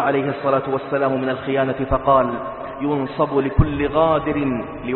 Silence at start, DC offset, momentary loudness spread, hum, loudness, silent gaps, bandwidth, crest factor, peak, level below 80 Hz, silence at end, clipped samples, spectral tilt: 0 s; under 0.1%; 7 LU; none; -20 LUFS; none; 4.3 kHz; 18 dB; -2 dBFS; -34 dBFS; 0 s; under 0.1%; -12 dB/octave